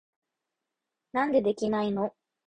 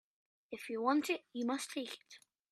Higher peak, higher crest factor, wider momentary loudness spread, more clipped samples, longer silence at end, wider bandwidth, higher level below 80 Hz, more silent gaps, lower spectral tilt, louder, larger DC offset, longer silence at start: first, -12 dBFS vs -18 dBFS; about the same, 18 dB vs 20 dB; second, 8 LU vs 16 LU; neither; about the same, 0.45 s vs 0.35 s; second, 9.6 kHz vs 14.5 kHz; first, -66 dBFS vs -88 dBFS; neither; first, -6.5 dB/octave vs -3 dB/octave; first, -28 LUFS vs -38 LUFS; neither; first, 1.15 s vs 0.5 s